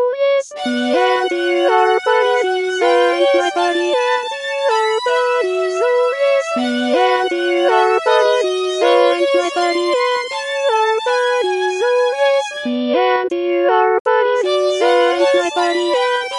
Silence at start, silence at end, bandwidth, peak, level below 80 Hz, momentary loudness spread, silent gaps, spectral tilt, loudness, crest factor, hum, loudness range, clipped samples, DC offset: 0 s; 0 s; 11.5 kHz; 0 dBFS; -68 dBFS; 4 LU; 14.00-14.05 s; -2 dB/octave; -15 LUFS; 16 dB; none; 2 LU; under 0.1%; under 0.1%